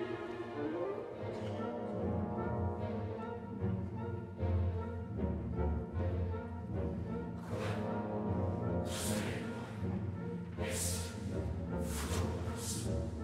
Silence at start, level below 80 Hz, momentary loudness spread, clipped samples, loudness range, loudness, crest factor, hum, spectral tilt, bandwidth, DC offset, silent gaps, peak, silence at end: 0 s; -48 dBFS; 5 LU; under 0.1%; 1 LU; -39 LUFS; 14 dB; none; -6 dB/octave; 16 kHz; under 0.1%; none; -24 dBFS; 0 s